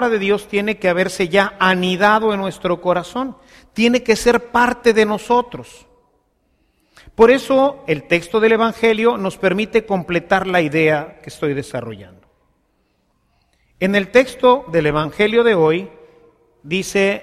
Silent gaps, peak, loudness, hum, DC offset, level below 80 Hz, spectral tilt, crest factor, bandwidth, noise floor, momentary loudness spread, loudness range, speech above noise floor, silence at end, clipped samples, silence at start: none; 0 dBFS; -16 LUFS; none; under 0.1%; -48 dBFS; -5 dB/octave; 18 dB; 14.5 kHz; -64 dBFS; 11 LU; 4 LU; 47 dB; 0 s; under 0.1%; 0 s